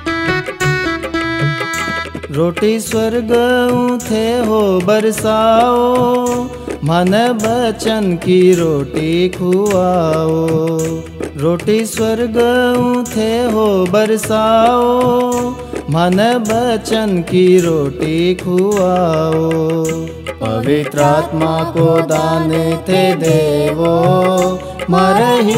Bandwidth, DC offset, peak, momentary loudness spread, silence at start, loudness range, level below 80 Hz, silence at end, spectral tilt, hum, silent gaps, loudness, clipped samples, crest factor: 16.5 kHz; under 0.1%; 0 dBFS; 7 LU; 0 s; 2 LU; -38 dBFS; 0 s; -5.5 dB/octave; none; none; -14 LUFS; under 0.1%; 14 dB